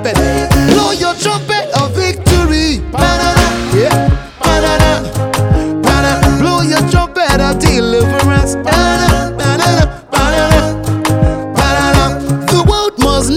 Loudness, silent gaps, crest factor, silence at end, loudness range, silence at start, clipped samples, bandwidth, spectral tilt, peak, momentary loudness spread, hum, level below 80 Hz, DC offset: -11 LUFS; none; 10 dB; 0 s; 1 LU; 0 s; 0.1%; 19 kHz; -5 dB/octave; 0 dBFS; 4 LU; none; -20 dBFS; under 0.1%